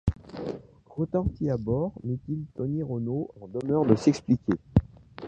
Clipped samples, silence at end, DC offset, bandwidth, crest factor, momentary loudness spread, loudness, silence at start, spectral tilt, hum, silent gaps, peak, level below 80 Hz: under 0.1%; 0 s; under 0.1%; 9 kHz; 22 dB; 14 LU; -28 LUFS; 0.05 s; -8.5 dB/octave; none; none; -6 dBFS; -42 dBFS